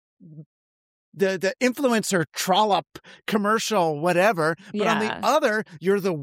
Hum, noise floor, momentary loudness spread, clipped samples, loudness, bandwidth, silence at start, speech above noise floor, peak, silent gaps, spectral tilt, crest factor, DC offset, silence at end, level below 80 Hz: none; under -90 dBFS; 5 LU; under 0.1%; -23 LUFS; 16 kHz; 0.25 s; over 67 dB; -6 dBFS; 0.46-1.12 s; -4 dB/octave; 18 dB; under 0.1%; 0 s; -72 dBFS